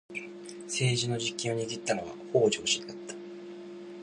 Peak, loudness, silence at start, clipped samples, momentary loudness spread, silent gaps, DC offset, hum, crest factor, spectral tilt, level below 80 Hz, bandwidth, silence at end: -12 dBFS; -30 LUFS; 0.1 s; under 0.1%; 18 LU; none; under 0.1%; none; 20 dB; -3.5 dB/octave; -68 dBFS; 11.5 kHz; 0 s